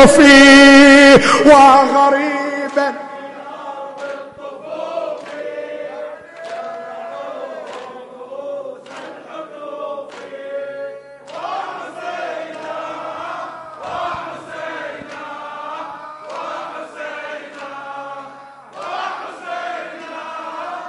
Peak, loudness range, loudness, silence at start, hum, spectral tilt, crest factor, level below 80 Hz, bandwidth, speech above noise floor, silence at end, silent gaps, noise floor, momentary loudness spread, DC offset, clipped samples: 0 dBFS; 19 LU; -9 LUFS; 0 s; none; -3.5 dB/octave; 16 dB; -46 dBFS; 11.5 kHz; 30 dB; 0 s; none; -38 dBFS; 25 LU; under 0.1%; under 0.1%